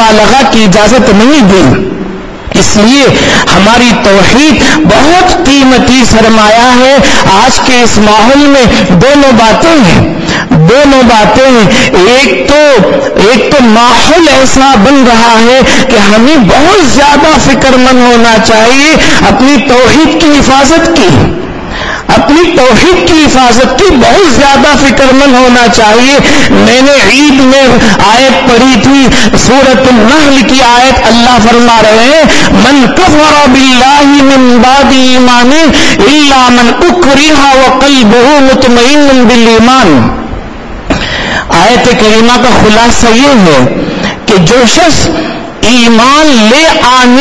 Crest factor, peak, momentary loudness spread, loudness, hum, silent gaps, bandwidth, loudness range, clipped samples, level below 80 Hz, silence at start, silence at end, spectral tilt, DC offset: 4 dB; 0 dBFS; 4 LU; -3 LUFS; none; none; 11 kHz; 2 LU; 20%; -22 dBFS; 0 s; 0 s; -4 dB/octave; 10%